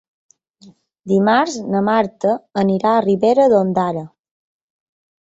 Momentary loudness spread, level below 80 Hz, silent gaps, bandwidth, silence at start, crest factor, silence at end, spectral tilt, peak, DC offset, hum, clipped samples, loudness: 7 LU; -60 dBFS; none; 8 kHz; 1.05 s; 16 dB; 1.15 s; -6.5 dB/octave; -2 dBFS; under 0.1%; none; under 0.1%; -16 LUFS